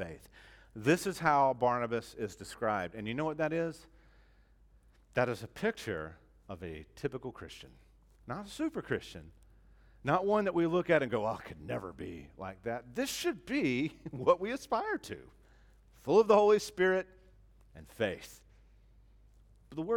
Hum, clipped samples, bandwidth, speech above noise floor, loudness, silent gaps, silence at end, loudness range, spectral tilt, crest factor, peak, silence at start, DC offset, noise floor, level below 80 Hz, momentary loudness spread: none; under 0.1%; 18 kHz; 31 dB; -33 LUFS; none; 0 s; 10 LU; -5.5 dB/octave; 22 dB; -12 dBFS; 0 s; under 0.1%; -63 dBFS; -62 dBFS; 18 LU